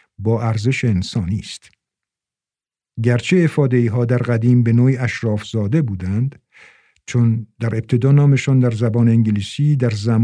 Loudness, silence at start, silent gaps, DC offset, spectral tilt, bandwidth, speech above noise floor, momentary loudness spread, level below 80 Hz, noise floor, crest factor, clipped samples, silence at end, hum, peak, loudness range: -17 LUFS; 0.2 s; none; under 0.1%; -7.5 dB/octave; 10 kHz; over 74 dB; 9 LU; -50 dBFS; under -90 dBFS; 14 dB; under 0.1%; 0 s; none; -4 dBFS; 4 LU